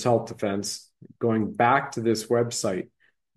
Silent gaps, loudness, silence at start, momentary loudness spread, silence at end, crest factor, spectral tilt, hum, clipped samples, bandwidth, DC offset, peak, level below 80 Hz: none; -25 LUFS; 0 s; 11 LU; 0.5 s; 20 dB; -5 dB/octave; none; under 0.1%; 12.5 kHz; under 0.1%; -6 dBFS; -66 dBFS